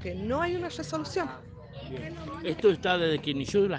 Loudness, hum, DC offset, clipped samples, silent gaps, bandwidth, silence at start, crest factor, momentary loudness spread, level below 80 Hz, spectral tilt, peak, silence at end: -29 LUFS; none; under 0.1%; under 0.1%; none; 9.4 kHz; 0 s; 18 dB; 15 LU; -54 dBFS; -5.5 dB/octave; -10 dBFS; 0 s